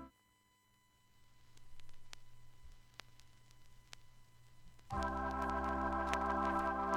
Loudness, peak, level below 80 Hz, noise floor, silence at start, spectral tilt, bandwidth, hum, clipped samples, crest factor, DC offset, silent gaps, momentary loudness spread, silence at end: -38 LUFS; -16 dBFS; -54 dBFS; -74 dBFS; 0 s; -5.5 dB/octave; 16.5 kHz; none; under 0.1%; 26 dB; under 0.1%; none; 23 LU; 0 s